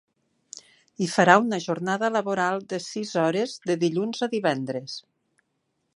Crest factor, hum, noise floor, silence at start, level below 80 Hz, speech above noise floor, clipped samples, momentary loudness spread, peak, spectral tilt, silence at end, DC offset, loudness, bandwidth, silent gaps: 24 dB; none; -75 dBFS; 1 s; -76 dBFS; 51 dB; under 0.1%; 20 LU; 0 dBFS; -5 dB/octave; 0.95 s; under 0.1%; -24 LUFS; 11.5 kHz; none